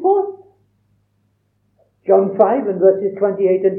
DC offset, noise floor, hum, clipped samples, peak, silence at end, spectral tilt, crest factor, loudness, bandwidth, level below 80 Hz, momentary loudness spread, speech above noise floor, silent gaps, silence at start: under 0.1%; -64 dBFS; 50 Hz at -65 dBFS; under 0.1%; 0 dBFS; 0 s; -11.5 dB/octave; 18 dB; -16 LUFS; 3 kHz; -74 dBFS; 6 LU; 49 dB; none; 0 s